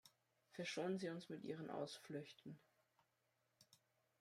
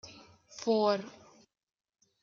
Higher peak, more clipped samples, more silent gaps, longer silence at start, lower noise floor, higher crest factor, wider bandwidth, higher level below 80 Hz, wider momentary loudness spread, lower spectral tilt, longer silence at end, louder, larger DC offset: second, -34 dBFS vs -16 dBFS; neither; neither; about the same, 0.05 s vs 0.05 s; first, -86 dBFS vs -56 dBFS; about the same, 20 dB vs 20 dB; first, 15.5 kHz vs 7.6 kHz; second, under -90 dBFS vs -80 dBFS; second, 15 LU vs 23 LU; about the same, -5 dB/octave vs -5 dB/octave; second, 0.45 s vs 1.15 s; second, -49 LUFS vs -31 LUFS; neither